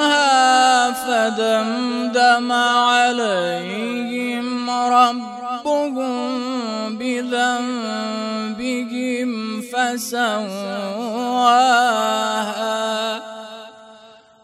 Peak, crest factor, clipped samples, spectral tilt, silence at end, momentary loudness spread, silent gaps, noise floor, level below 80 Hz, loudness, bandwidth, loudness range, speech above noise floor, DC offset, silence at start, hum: -2 dBFS; 18 dB; under 0.1%; -2.5 dB/octave; 0.35 s; 11 LU; none; -46 dBFS; -68 dBFS; -19 LUFS; 14 kHz; 6 LU; 27 dB; under 0.1%; 0 s; none